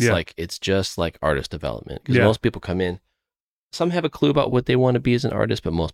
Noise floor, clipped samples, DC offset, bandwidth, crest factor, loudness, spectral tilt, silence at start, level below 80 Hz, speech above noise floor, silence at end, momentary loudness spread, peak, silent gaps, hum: under -90 dBFS; under 0.1%; under 0.1%; 15.5 kHz; 18 dB; -22 LUFS; -6 dB/octave; 0 s; -42 dBFS; over 69 dB; 0 s; 11 LU; -4 dBFS; 3.40-3.69 s; none